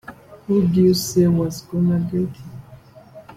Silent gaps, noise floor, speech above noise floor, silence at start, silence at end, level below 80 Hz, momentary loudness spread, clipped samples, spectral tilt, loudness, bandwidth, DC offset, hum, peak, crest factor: none; -44 dBFS; 26 dB; 0.1 s; 0.05 s; -52 dBFS; 22 LU; under 0.1%; -7 dB/octave; -19 LUFS; 16 kHz; under 0.1%; none; -6 dBFS; 16 dB